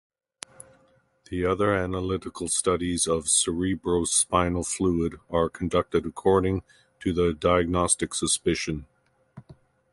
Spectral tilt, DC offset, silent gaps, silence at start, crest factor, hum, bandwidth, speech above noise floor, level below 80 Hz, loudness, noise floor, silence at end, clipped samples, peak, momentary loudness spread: -4 dB/octave; under 0.1%; none; 1.3 s; 20 dB; none; 11.5 kHz; 38 dB; -44 dBFS; -25 LUFS; -63 dBFS; 0.4 s; under 0.1%; -6 dBFS; 11 LU